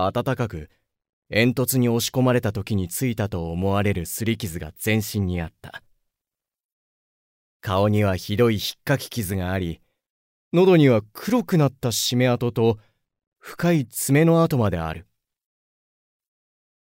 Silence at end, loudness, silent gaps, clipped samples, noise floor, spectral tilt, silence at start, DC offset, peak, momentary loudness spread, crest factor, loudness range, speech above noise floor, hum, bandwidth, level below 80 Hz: 1.8 s; -22 LUFS; 1.09-1.22 s, 6.65-7.60 s, 10.10-10.51 s, 13.27-13.32 s; under 0.1%; -89 dBFS; -5.5 dB/octave; 0 s; under 0.1%; -4 dBFS; 12 LU; 18 dB; 7 LU; 67 dB; none; 16.5 kHz; -48 dBFS